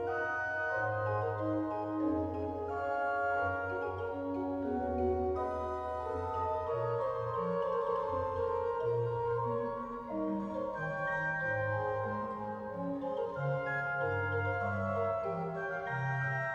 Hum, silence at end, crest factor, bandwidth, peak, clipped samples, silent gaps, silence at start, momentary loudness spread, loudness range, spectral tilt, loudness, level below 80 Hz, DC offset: none; 0 s; 12 dB; 8 kHz; -22 dBFS; under 0.1%; none; 0 s; 4 LU; 1 LU; -8.5 dB/octave; -35 LUFS; -56 dBFS; under 0.1%